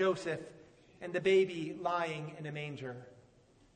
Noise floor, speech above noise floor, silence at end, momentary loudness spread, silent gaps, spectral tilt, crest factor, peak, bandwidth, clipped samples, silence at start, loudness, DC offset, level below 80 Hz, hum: -65 dBFS; 30 dB; 0.6 s; 17 LU; none; -6 dB/octave; 16 dB; -18 dBFS; 9.4 kHz; under 0.1%; 0 s; -35 LUFS; under 0.1%; -74 dBFS; none